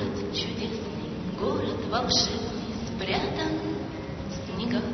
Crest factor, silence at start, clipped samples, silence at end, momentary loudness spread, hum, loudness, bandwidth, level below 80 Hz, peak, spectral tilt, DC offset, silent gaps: 20 dB; 0 s; under 0.1%; 0 s; 10 LU; none; -29 LUFS; 6.4 kHz; -46 dBFS; -10 dBFS; -4.5 dB/octave; under 0.1%; none